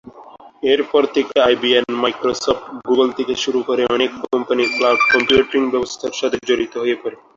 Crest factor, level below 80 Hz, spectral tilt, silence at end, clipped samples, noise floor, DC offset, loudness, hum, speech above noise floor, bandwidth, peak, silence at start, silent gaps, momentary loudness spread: 16 dB; -52 dBFS; -3 dB/octave; 0.2 s; under 0.1%; -41 dBFS; under 0.1%; -17 LUFS; none; 24 dB; 7.6 kHz; -2 dBFS; 0.05 s; none; 8 LU